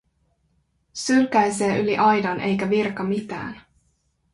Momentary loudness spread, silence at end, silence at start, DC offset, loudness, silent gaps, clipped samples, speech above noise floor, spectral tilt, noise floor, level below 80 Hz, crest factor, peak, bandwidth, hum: 14 LU; 0.75 s; 0.95 s; under 0.1%; -21 LUFS; none; under 0.1%; 46 dB; -5 dB/octave; -67 dBFS; -58 dBFS; 16 dB; -6 dBFS; 11.5 kHz; none